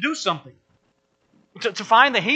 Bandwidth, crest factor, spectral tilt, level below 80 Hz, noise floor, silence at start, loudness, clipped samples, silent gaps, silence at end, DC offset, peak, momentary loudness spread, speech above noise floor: 8.8 kHz; 22 dB; -3 dB/octave; -74 dBFS; -67 dBFS; 0 s; -20 LUFS; under 0.1%; none; 0 s; under 0.1%; 0 dBFS; 13 LU; 47 dB